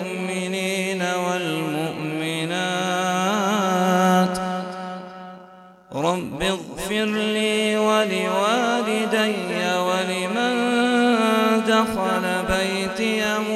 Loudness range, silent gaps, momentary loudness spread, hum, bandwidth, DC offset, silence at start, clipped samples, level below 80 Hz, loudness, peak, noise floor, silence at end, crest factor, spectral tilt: 4 LU; none; 8 LU; 50 Hz at -60 dBFS; 14.5 kHz; under 0.1%; 0 s; under 0.1%; -50 dBFS; -21 LUFS; -4 dBFS; -46 dBFS; 0 s; 18 dB; -4.5 dB/octave